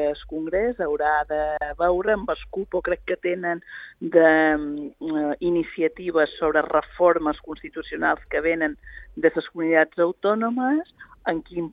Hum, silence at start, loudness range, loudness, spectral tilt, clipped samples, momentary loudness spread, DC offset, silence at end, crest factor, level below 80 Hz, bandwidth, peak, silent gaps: none; 0 s; 3 LU; -23 LUFS; -8.5 dB/octave; under 0.1%; 12 LU; under 0.1%; 0 s; 20 dB; -48 dBFS; 4.9 kHz; -4 dBFS; none